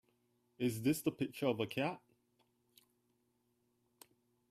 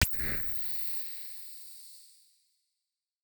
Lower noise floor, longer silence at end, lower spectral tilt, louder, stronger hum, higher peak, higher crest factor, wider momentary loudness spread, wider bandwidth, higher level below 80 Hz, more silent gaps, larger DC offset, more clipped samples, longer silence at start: second, -80 dBFS vs -88 dBFS; first, 2.55 s vs 1.1 s; first, -5.5 dB/octave vs -2.5 dB/octave; second, -38 LUFS vs -32 LUFS; neither; second, -20 dBFS vs -10 dBFS; about the same, 22 dB vs 26 dB; second, 5 LU vs 18 LU; second, 15.5 kHz vs over 20 kHz; second, -76 dBFS vs -48 dBFS; neither; neither; neither; first, 0.6 s vs 0 s